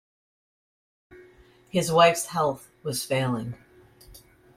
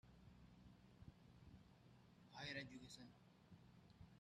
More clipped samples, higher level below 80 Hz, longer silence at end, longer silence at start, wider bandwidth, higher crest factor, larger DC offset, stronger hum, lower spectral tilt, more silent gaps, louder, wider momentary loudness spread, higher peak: neither; first, -60 dBFS vs -76 dBFS; first, 0.45 s vs 0 s; first, 1.1 s vs 0.05 s; first, 16.5 kHz vs 11.5 kHz; about the same, 22 dB vs 24 dB; neither; neither; about the same, -4 dB/octave vs -4.5 dB/octave; neither; first, -24 LUFS vs -60 LUFS; about the same, 16 LU vs 16 LU; first, -6 dBFS vs -38 dBFS